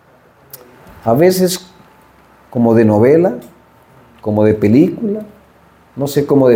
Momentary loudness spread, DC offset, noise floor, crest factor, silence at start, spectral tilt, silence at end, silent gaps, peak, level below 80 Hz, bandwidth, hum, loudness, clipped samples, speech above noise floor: 14 LU; under 0.1%; -47 dBFS; 14 dB; 1.05 s; -7 dB/octave; 0 s; none; 0 dBFS; -52 dBFS; 17 kHz; none; -13 LUFS; under 0.1%; 36 dB